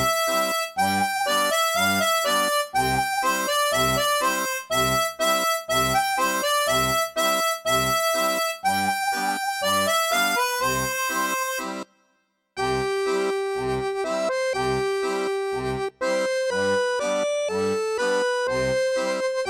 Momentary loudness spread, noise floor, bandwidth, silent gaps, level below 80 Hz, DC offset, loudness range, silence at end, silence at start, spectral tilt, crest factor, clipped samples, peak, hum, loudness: 6 LU; -69 dBFS; 17 kHz; none; -50 dBFS; under 0.1%; 4 LU; 0 s; 0 s; -2.5 dB/octave; 14 dB; under 0.1%; -10 dBFS; none; -23 LUFS